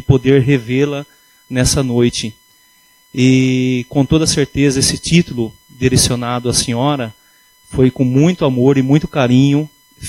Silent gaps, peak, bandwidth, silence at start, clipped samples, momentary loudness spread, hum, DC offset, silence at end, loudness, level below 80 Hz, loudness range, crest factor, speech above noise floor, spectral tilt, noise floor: none; 0 dBFS; 15.5 kHz; 0.1 s; under 0.1%; 11 LU; none; under 0.1%; 0 s; -14 LUFS; -36 dBFS; 2 LU; 14 dB; 37 dB; -5 dB/octave; -51 dBFS